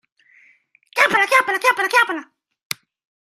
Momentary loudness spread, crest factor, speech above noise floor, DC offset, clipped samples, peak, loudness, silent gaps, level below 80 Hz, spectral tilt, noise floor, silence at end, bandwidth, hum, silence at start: 16 LU; 20 dB; 38 dB; under 0.1%; under 0.1%; 0 dBFS; -16 LUFS; none; -72 dBFS; -1.5 dB/octave; -56 dBFS; 1.1 s; 15.5 kHz; none; 0.95 s